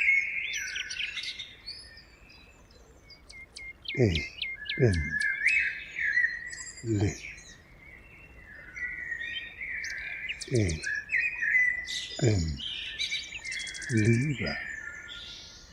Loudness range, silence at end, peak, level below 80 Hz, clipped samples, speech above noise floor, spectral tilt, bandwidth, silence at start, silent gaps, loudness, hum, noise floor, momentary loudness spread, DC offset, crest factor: 8 LU; 0 s; -10 dBFS; -50 dBFS; under 0.1%; 28 dB; -4.5 dB/octave; 12.5 kHz; 0 s; none; -29 LUFS; none; -55 dBFS; 19 LU; under 0.1%; 22 dB